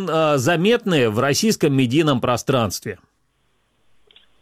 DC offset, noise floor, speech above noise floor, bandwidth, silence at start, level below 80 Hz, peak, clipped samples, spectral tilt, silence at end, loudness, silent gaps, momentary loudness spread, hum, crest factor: under 0.1%; -65 dBFS; 47 dB; 16.5 kHz; 0 s; -54 dBFS; -6 dBFS; under 0.1%; -5 dB/octave; 1.45 s; -18 LUFS; none; 8 LU; none; 14 dB